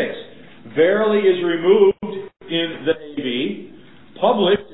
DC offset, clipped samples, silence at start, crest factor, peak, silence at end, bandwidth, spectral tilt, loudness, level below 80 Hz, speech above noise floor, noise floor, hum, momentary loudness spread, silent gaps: 0.6%; under 0.1%; 0 s; 16 dB; -2 dBFS; 0 s; 4.1 kHz; -10.5 dB/octave; -18 LUFS; -58 dBFS; 28 dB; -45 dBFS; none; 14 LU; none